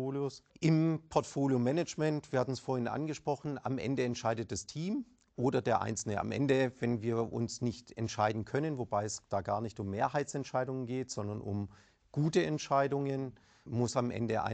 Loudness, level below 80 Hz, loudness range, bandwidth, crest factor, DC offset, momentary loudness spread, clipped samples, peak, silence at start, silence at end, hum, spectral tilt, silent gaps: -34 LUFS; -66 dBFS; 3 LU; 9 kHz; 20 dB; under 0.1%; 8 LU; under 0.1%; -14 dBFS; 0 s; 0 s; none; -6 dB/octave; none